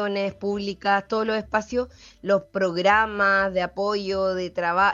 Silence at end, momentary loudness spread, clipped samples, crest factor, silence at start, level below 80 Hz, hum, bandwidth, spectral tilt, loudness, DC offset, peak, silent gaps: 0 s; 9 LU; under 0.1%; 18 dB; 0 s; -52 dBFS; none; 7.6 kHz; -5 dB/octave; -23 LUFS; under 0.1%; -6 dBFS; none